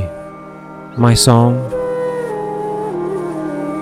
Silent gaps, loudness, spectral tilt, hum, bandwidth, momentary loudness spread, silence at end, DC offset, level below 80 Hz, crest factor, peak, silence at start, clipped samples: none; -16 LUFS; -5.5 dB/octave; none; 14.5 kHz; 22 LU; 0 s; under 0.1%; -38 dBFS; 16 dB; 0 dBFS; 0 s; under 0.1%